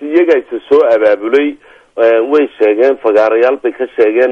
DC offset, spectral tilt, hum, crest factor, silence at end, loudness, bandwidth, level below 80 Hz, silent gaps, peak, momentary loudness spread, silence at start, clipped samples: under 0.1%; -5.5 dB/octave; none; 10 dB; 0 s; -11 LUFS; 6.6 kHz; -58 dBFS; none; 0 dBFS; 5 LU; 0 s; under 0.1%